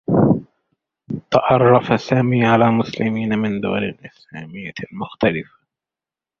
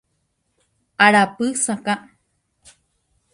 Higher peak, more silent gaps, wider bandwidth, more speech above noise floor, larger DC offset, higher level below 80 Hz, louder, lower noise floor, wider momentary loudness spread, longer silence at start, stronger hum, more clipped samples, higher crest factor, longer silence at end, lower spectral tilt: about the same, 0 dBFS vs 0 dBFS; neither; second, 6.8 kHz vs 11.5 kHz; first, 71 dB vs 53 dB; neither; first, -50 dBFS vs -66 dBFS; about the same, -17 LUFS vs -18 LUFS; first, -89 dBFS vs -70 dBFS; first, 17 LU vs 13 LU; second, 0.1 s vs 1 s; neither; neither; about the same, 18 dB vs 22 dB; second, 0.95 s vs 1.35 s; first, -8 dB/octave vs -3 dB/octave